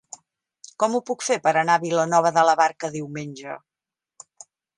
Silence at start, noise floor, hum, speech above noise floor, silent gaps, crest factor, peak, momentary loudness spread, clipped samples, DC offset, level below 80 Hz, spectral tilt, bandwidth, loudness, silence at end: 0.8 s; -89 dBFS; none; 68 dB; none; 20 dB; -4 dBFS; 19 LU; under 0.1%; under 0.1%; -74 dBFS; -4 dB/octave; 11 kHz; -21 LUFS; 1.2 s